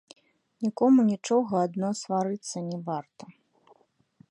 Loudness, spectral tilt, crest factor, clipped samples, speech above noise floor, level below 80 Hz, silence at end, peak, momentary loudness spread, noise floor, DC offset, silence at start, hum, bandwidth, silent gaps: -27 LUFS; -6.5 dB/octave; 16 dB; under 0.1%; 37 dB; -76 dBFS; 1 s; -12 dBFS; 13 LU; -63 dBFS; under 0.1%; 0.6 s; none; 11 kHz; none